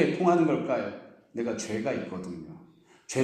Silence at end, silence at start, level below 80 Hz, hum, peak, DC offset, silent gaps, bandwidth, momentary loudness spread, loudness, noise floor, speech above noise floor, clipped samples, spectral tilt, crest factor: 0 s; 0 s; -68 dBFS; none; -10 dBFS; under 0.1%; none; 11.5 kHz; 18 LU; -29 LUFS; -56 dBFS; 28 dB; under 0.1%; -6 dB/octave; 20 dB